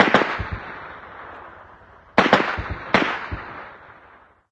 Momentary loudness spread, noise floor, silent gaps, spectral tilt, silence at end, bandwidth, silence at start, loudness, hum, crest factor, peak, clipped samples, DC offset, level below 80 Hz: 22 LU; -51 dBFS; none; -5.5 dB/octave; 0.6 s; 9.8 kHz; 0 s; -21 LUFS; none; 24 dB; 0 dBFS; under 0.1%; under 0.1%; -42 dBFS